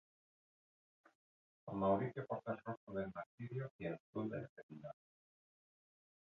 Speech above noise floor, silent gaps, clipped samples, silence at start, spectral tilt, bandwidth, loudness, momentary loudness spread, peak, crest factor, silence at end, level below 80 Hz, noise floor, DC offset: over 47 dB; 2.77-2.87 s, 3.26-3.38 s, 3.71-3.79 s, 4.00-4.13 s, 4.49-4.56 s, 4.63-4.69 s; under 0.1%; 1.65 s; -7.5 dB/octave; 6.4 kHz; -44 LUFS; 17 LU; -26 dBFS; 22 dB; 1.35 s; -74 dBFS; under -90 dBFS; under 0.1%